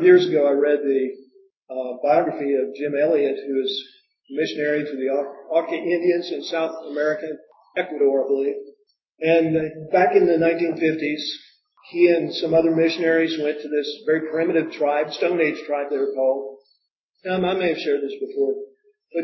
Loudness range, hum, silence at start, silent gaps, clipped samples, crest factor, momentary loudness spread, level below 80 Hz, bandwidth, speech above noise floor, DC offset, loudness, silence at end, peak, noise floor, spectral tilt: 4 LU; none; 0 s; 1.57-1.66 s, 16.91-17.14 s; under 0.1%; 18 dB; 11 LU; -66 dBFS; 6 kHz; 50 dB; under 0.1%; -21 LUFS; 0 s; -2 dBFS; -71 dBFS; -6.5 dB/octave